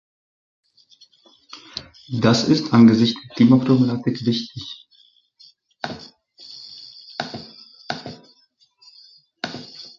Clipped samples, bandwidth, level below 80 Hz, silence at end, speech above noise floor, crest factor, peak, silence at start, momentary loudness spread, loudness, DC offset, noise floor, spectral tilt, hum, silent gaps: under 0.1%; 7.4 kHz; -58 dBFS; 0.15 s; 44 dB; 20 dB; -2 dBFS; 1.55 s; 25 LU; -19 LUFS; under 0.1%; -60 dBFS; -6.5 dB/octave; none; none